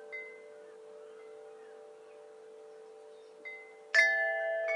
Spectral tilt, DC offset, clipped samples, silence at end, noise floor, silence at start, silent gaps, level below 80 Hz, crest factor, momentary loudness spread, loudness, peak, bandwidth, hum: 1 dB/octave; under 0.1%; under 0.1%; 0 s; -53 dBFS; 0 s; none; under -90 dBFS; 24 dB; 27 LU; -29 LUFS; -12 dBFS; 11 kHz; none